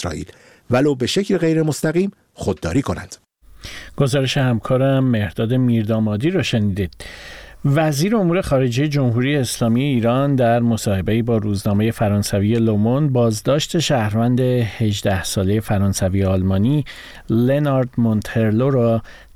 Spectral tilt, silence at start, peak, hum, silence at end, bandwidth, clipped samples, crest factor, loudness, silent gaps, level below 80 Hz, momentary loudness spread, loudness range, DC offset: -6.5 dB/octave; 0 s; -2 dBFS; none; 0.2 s; 16 kHz; under 0.1%; 16 dB; -18 LUFS; none; -42 dBFS; 9 LU; 3 LU; 0.1%